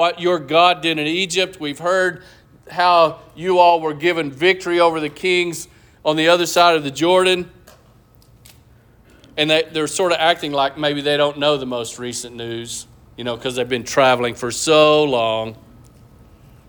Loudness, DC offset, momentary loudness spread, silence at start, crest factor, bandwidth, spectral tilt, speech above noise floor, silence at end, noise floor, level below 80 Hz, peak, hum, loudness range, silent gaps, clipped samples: -17 LUFS; under 0.1%; 14 LU; 0 s; 18 dB; over 20 kHz; -3.5 dB/octave; 33 dB; 1.15 s; -50 dBFS; -54 dBFS; -2 dBFS; none; 5 LU; none; under 0.1%